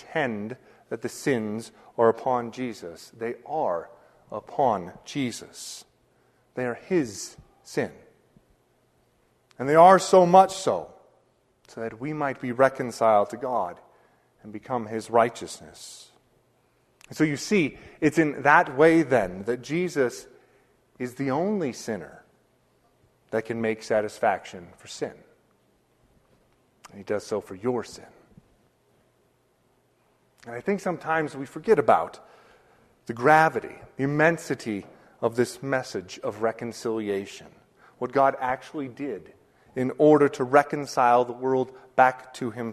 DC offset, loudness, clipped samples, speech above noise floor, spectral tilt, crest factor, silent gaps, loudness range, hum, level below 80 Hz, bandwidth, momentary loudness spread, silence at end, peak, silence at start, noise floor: under 0.1%; -25 LUFS; under 0.1%; 42 dB; -5.5 dB/octave; 24 dB; none; 13 LU; none; -64 dBFS; 13.5 kHz; 20 LU; 0 s; -2 dBFS; 0.1 s; -66 dBFS